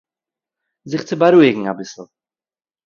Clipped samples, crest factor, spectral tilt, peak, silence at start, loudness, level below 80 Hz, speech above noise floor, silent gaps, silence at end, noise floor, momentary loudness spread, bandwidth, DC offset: under 0.1%; 18 dB; -6.5 dB/octave; 0 dBFS; 0.85 s; -15 LUFS; -64 dBFS; 73 dB; none; 0.85 s; -88 dBFS; 18 LU; 7.2 kHz; under 0.1%